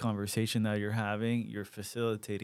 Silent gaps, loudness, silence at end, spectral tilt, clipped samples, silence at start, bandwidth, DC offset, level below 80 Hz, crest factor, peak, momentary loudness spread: none; -34 LUFS; 0 s; -5.5 dB/octave; under 0.1%; 0 s; 16 kHz; under 0.1%; -74 dBFS; 16 dB; -18 dBFS; 9 LU